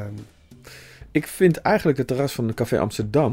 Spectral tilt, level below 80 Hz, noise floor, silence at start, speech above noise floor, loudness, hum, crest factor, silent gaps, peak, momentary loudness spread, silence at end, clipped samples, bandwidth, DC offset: -6.5 dB/octave; -48 dBFS; -47 dBFS; 0 s; 26 dB; -22 LUFS; none; 18 dB; none; -4 dBFS; 22 LU; 0 s; under 0.1%; 16 kHz; under 0.1%